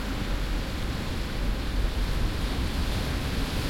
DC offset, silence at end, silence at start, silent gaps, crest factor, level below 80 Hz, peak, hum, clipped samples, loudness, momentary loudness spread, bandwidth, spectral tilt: under 0.1%; 0 s; 0 s; none; 14 dB; -30 dBFS; -14 dBFS; none; under 0.1%; -31 LUFS; 2 LU; 16.5 kHz; -5 dB/octave